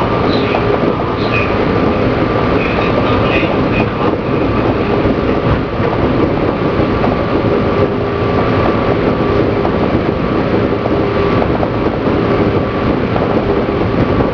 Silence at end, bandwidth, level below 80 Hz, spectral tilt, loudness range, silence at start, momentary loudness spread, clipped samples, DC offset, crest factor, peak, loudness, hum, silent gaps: 0 s; 5.4 kHz; -28 dBFS; -8.5 dB/octave; 1 LU; 0 s; 2 LU; under 0.1%; under 0.1%; 12 dB; 0 dBFS; -14 LUFS; none; none